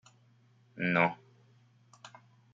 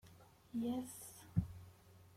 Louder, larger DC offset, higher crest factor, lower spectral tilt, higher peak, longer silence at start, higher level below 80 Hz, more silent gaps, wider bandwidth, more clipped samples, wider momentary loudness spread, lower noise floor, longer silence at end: first, -30 LUFS vs -44 LUFS; neither; about the same, 26 dB vs 22 dB; about the same, -7 dB/octave vs -7 dB/octave; first, -10 dBFS vs -22 dBFS; first, 0.75 s vs 0.05 s; second, -76 dBFS vs -64 dBFS; neither; second, 7.6 kHz vs 16.5 kHz; neither; first, 27 LU vs 22 LU; about the same, -65 dBFS vs -64 dBFS; first, 0.45 s vs 0 s